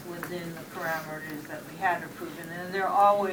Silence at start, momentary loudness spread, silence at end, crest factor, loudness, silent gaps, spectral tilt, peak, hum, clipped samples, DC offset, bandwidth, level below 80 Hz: 0 s; 16 LU; 0 s; 20 dB; -30 LUFS; none; -5 dB/octave; -10 dBFS; none; under 0.1%; under 0.1%; 20 kHz; -70 dBFS